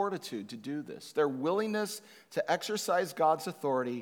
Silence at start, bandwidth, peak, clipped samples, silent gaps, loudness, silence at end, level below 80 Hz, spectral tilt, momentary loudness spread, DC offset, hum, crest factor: 0 s; 19.5 kHz; -14 dBFS; under 0.1%; none; -33 LUFS; 0 s; under -90 dBFS; -4 dB/octave; 11 LU; under 0.1%; none; 18 dB